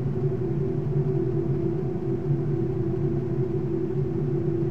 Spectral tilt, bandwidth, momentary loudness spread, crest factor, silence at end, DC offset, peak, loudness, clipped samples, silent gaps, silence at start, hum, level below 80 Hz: -11.5 dB/octave; 3.6 kHz; 2 LU; 12 dB; 0 s; 1%; -14 dBFS; -27 LUFS; under 0.1%; none; 0 s; none; -44 dBFS